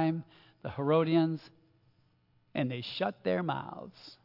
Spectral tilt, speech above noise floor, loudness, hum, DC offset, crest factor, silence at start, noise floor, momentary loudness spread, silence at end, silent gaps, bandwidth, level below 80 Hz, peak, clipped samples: -9 dB/octave; 37 dB; -32 LUFS; none; under 0.1%; 18 dB; 0 s; -69 dBFS; 17 LU; 0.1 s; none; 5.8 kHz; -74 dBFS; -14 dBFS; under 0.1%